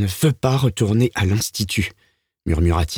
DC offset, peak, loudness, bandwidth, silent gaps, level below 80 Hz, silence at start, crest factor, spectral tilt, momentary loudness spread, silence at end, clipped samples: under 0.1%; -4 dBFS; -20 LUFS; over 20 kHz; none; -32 dBFS; 0 s; 14 dB; -5.5 dB/octave; 6 LU; 0 s; under 0.1%